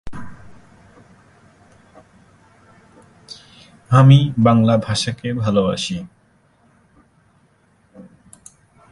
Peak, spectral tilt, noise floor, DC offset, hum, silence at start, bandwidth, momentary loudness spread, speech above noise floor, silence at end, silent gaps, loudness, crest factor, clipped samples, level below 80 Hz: 0 dBFS; -6.5 dB/octave; -57 dBFS; under 0.1%; none; 0.05 s; 11.5 kHz; 28 LU; 43 dB; 0.9 s; none; -16 LUFS; 20 dB; under 0.1%; -50 dBFS